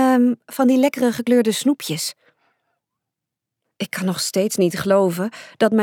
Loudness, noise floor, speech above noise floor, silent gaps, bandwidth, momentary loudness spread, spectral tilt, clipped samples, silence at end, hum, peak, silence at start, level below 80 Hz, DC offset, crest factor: -19 LUFS; -84 dBFS; 65 dB; none; 18.5 kHz; 10 LU; -5 dB/octave; under 0.1%; 0 s; none; -4 dBFS; 0 s; -64 dBFS; under 0.1%; 16 dB